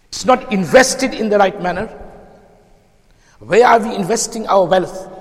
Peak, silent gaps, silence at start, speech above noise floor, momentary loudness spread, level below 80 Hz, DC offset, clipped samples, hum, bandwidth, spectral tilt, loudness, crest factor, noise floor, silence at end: 0 dBFS; none; 0.1 s; 37 dB; 11 LU; -44 dBFS; under 0.1%; under 0.1%; none; 15 kHz; -4 dB/octave; -14 LUFS; 16 dB; -51 dBFS; 0 s